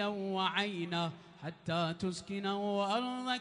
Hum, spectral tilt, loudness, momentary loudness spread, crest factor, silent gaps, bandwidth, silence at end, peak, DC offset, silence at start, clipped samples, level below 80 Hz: none; -5 dB/octave; -35 LUFS; 7 LU; 18 dB; none; 10.5 kHz; 0 s; -18 dBFS; under 0.1%; 0 s; under 0.1%; -72 dBFS